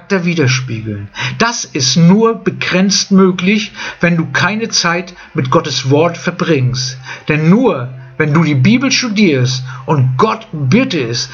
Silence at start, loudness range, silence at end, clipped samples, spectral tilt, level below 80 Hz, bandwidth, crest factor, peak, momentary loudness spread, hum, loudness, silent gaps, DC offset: 0.1 s; 2 LU; 0 s; under 0.1%; -5 dB/octave; -48 dBFS; 7.4 kHz; 12 dB; 0 dBFS; 10 LU; none; -13 LUFS; none; under 0.1%